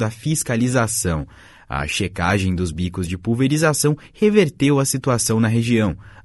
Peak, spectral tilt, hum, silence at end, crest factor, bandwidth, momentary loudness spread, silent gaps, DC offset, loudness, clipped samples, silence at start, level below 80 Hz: -2 dBFS; -5 dB/octave; none; 0.15 s; 18 dB; 12 kHz; 8 LU; none; under 0.1%; -19 LUFS; under 0.1%; 0 s; -40 dBFS